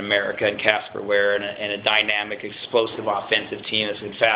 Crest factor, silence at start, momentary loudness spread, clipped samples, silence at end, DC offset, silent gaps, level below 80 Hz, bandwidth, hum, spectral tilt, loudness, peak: 22 dB; 0 s; 7 LU; under 0.1%; 0 s; under 0.1%; none; -60 dBFS; 4 kHz; none; -7 dB/octave; -22 LUFS; -2 dBFS